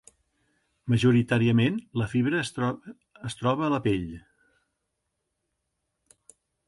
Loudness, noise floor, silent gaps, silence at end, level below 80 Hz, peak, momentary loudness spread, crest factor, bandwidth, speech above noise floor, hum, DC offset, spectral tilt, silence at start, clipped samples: -25 LUFS; -80 dBFS; none; 2.5 s; -56 dBFS; -10 dBFS; 18 LU; 18 dB; 11.5 kHz; 55 dB; none; under 0.1%; -7 dB/octave; 0.85 s; under 0.1%